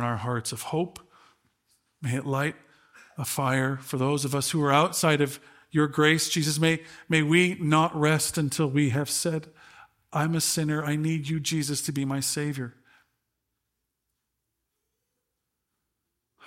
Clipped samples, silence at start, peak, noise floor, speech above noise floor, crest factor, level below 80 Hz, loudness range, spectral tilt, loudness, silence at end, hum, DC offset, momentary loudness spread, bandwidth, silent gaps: under 0.1%; 0 s; -6 dBFS; -82 dBFS; 56 dB; 22 dB; -64 dBFS; 9 LU; -4.5 dB/octave; -26 LUFS; 0 s; none; under 0.1%; 10 LU; 16.5 kHz; none